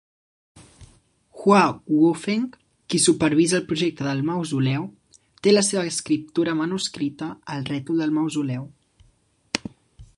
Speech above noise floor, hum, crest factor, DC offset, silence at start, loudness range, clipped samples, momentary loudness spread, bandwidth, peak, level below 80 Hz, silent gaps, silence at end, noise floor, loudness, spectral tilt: 40 dB; none; 22 dB; under 0.1%; 0.55 s; 6 LU; under 0.1%; 12 LU; 11.5 kHz; -2 dBFS; -60 dBFS; none; 0.15 s; -62 dBFS; -22 LUFS; -4.5 dB/octave